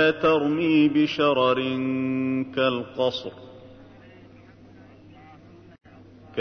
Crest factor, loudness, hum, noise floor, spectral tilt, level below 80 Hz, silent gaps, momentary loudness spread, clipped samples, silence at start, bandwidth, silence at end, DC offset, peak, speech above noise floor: 16 dB; -23 LUFS; none; -49 dBFS; -7 dB/octave; -62 dBFS; none; 11 LU; under 0.1%; 0 s; 6.4 kHz; 0 s; under 0.1%; -8 dBFS; 27 dB